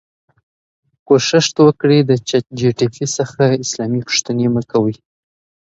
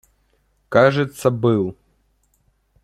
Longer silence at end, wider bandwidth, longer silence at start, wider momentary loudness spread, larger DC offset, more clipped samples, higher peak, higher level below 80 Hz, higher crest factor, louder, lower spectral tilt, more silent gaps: second, 0.75 s vs 1.1 s; second, 8.2 kHz vs 14 kHz; first, 1.1 s vs 0.7 s; about the same, 8 LU vs 6 LU; neither; neither; about the same, 0 dBFS vs 0 dBFS; about the same, -56 dBFS vs -58 dBFS; about the same, 16 dB vs 20 dB; first, -15 LUFS vs -18 LUFS; second, -5 dB/octave vs -7 dB/octave; neither